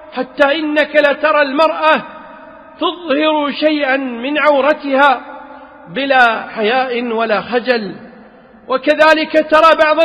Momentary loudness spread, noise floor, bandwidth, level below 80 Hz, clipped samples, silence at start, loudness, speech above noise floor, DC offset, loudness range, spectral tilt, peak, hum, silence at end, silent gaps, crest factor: 11 LU; -41 dBFS; 10 kHz; -54 dBFS; under 0.1%; 0 s; -13 LUFS; 28 dB; under 0.1%; 2 LU; -4.5 dB/octave; 0 dBFS; none; 0 s; none; 14 dB